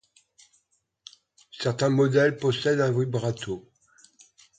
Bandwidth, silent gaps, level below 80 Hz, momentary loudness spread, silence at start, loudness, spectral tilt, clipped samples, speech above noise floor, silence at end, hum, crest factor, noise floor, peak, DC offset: 9.4 kHz; none; -64 dBFS; 12 LU; 1.55 s; -25 LUFS; -6 dB/octave; under 0.1%; 48 dB; 1 s; none; 18 dB; -72 dBFS; -10 dBFS; under 0.1%